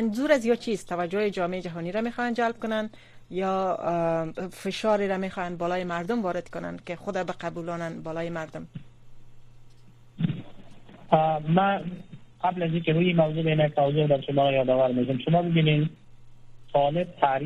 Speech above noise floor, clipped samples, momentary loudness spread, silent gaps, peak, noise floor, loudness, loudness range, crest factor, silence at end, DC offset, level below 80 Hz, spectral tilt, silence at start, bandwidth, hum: 24 dB; under 0.1%; 11 LU; none; -6 dBFS; -49 dBFS; -26 LUFS; 11 LU; 20 dB; 0 s; under 0.1%; -56 dBFS; -7 dB/octave; 0 s; 11.5 kHz; none